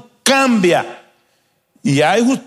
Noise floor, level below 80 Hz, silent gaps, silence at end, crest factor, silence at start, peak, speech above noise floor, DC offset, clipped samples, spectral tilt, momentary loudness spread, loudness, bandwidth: -62 dBFS; -62 dBFS; none; 0.05 s; 16 dB; 0.25 s; 0 dBFS; 48 dB; under 0.1%; under 0.1%; -4.5 dB/octave; 9 LU; -14 LUFS; 15 kHz